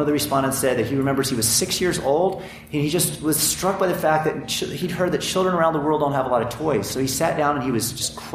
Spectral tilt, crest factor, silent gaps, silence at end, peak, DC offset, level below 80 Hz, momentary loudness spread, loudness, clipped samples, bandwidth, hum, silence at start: -4 dB/octave; 16 dB; none; 0 s; -6 dBFS; under 0.1%; -50 dBFS; 5 LU; -21 LUFS; under 0.1%; 15.5 kHz; none; 0 s